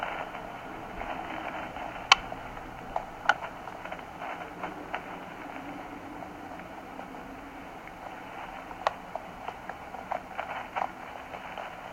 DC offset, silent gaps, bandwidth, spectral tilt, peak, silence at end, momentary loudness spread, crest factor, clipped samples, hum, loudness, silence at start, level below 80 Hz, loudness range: under 0.1%; none; 16.5 kHz; -2.5 dB/octave; 0 dBFS; 0 s; 13 LU; 34 dB; under 0.1%; none; -35 LUFS; 0 s; -56 dBFS; 11 LU